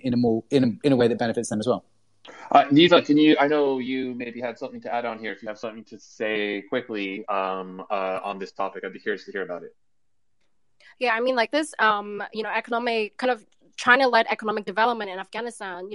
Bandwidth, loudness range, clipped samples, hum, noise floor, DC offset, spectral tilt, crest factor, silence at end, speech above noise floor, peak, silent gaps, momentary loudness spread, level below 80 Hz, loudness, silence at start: 11.5 kHz; 10 LU; under 0.1%; none; -80 dBFS; under 0.1%; -5 dB/octave; 22 dB; 0 s; 57 dB; -2 dBFS; none; 15 LU; -68 dBFS; -23 LUFS; 0.05 s